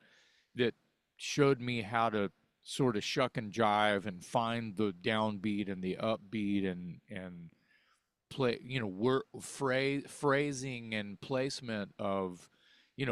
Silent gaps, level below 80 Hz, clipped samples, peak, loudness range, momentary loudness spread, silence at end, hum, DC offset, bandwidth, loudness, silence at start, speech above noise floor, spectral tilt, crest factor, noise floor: none; -70 dBFS; under 0.1%; -14 dBFS; 5 LU; 13 LU; 0 s; none; under 0.1%; 13.5 kHz; -34 LUFS; 0.55 s; 41 dB; -5 dB/octave; 22 dB; -75 dBFS